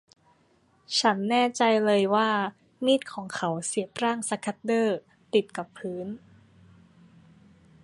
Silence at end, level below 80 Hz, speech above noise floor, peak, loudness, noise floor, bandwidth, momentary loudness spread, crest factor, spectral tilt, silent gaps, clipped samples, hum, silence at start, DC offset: 1.65 s; -72 dBFS; 38 dB; -8 dBFS; -26 LUFS; -64 dBFS; 11.5 kHz; 13 LU; 20 dB; -4 dB/octave; none; under 0.1%; none; 0.9 s; under 0.1%